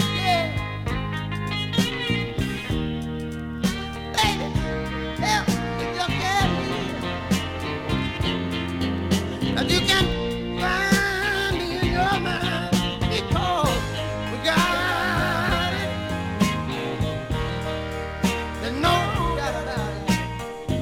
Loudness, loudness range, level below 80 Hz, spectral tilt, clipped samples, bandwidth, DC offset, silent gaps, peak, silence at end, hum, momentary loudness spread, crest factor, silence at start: -24 LUFS; 4 LU; -36 dBFS; -4.5 dB/octave; under 0.1%; 17 kHz; under 0.1%; none; -4 dBFS; 0 s; none; 8 LU; 20 dB; 0 s